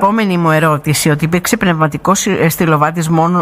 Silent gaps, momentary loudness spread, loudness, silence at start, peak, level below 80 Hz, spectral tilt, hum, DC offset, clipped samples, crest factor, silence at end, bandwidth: none; 2 LU; -12 LUFS; 0 s; 0 dBFS; -42 dBFS; -5 dB/octave; none; under 0.1%; under 0.1%; 12 dB; 0 s; 16 kHz